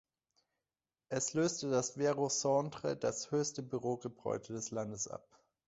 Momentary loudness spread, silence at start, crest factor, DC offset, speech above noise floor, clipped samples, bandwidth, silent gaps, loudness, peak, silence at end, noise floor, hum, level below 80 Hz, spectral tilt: 8 LU; 1.1 s; 18 dB; under 0.1%; over 54 dB; under 0.1%; 8 kHz; none; -36 LUFS; -20 dBFS; 0.5 s; under -90 dBFS; none; -74 dBFS; -5.5 dB/octave